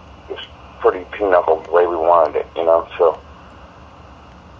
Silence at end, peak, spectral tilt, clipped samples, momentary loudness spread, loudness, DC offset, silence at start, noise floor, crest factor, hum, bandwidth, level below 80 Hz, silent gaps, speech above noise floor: 0.45 s; 0 dBFS; -6.5 dB/octave; under 0.1%; 18 LU; -17 LUFS; under 0.1%; 0.3 s; -41 dBFS; 18 dB; none; 6.8 kHz; -46 dBFS; none; 25 dB